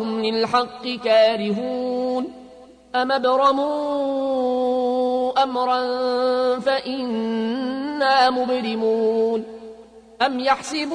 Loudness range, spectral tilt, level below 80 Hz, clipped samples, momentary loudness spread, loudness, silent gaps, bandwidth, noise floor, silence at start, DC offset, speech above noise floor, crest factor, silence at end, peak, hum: 1 LU; -4.5 dB/octave; -62 dBFS; under 0.1%; 8 LU; -21 LUFS; none; 10.5 kHz; -45 dBFS; 0 s; under 0.1%; 25 dB; 16 dB; 0 s; -6 dBFS; none